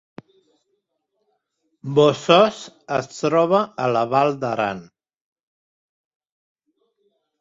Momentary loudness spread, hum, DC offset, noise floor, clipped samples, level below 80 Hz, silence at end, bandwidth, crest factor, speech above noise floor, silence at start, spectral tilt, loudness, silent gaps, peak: 11 LU; none; under 0.1%; -74 dBFS; under 0.1%; -64 dBFS; 2.6 s; 7.8 kHz; 22 dB; 55 dB; 1.85 s; -5.5 dB/octave; -19 LUFS; none; -2 dBFS